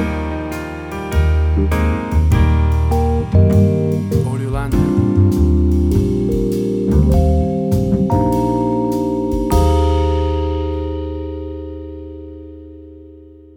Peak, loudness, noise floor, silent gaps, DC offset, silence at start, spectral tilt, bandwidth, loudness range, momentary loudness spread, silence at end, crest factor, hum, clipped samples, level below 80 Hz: -2 dBFS; -16 LUFS; -40 dBFS; none; under 0.1%; 0 s; -8.5 dB/octave; 16.5 kHz; 4 LU; 14 LU; 0.25 s; 14 dB; none; under 0.1%; -20 dBFS